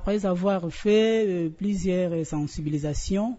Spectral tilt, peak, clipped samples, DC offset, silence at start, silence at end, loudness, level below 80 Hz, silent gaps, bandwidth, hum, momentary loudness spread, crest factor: -6.5 dB/octave; -12 dBFS; under 0.1%; under 0.1%; 0 s; 0 s; -25 LUFS; -40 dBFS; none; 8 kHz; none; 8 LU; 12 dB